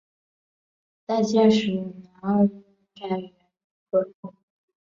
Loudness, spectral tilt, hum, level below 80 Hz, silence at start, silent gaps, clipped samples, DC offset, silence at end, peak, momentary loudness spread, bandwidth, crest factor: -24 LUFS; -6.5 dB/octave; none; -66 dBFS; 1.1 s; 3.64-3.86 s, 4.15-4.23 s; under 0.1%; under 0.1%; 0.55 s; -8 dBFS; 24 LU; 7.6 kHz; 18 dB